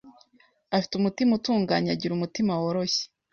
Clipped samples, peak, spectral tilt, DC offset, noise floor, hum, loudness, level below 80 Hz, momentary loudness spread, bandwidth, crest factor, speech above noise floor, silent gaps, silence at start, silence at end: under 0.1%; -10 dBFS; -5.5 dB/octave; under 0.1%; -63 dBFS; none; -26 LUFS; -64 dBFS; 5 LU; 7.2 kHz; 16 dB; 38 dB; none; 0.05 s; 0.25 s